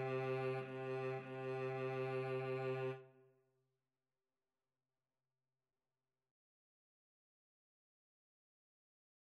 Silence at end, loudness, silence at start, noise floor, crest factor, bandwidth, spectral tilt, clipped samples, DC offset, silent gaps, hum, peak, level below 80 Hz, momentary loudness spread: 6.15 s; -43 LUFS; 0 s; under -90 dBFS; 16 dB; 10.5 kHz; -8 dB/octave; under 0.1%; under 0.1%; none; none; -32 dBFS; under -90 dBFS; 5 LU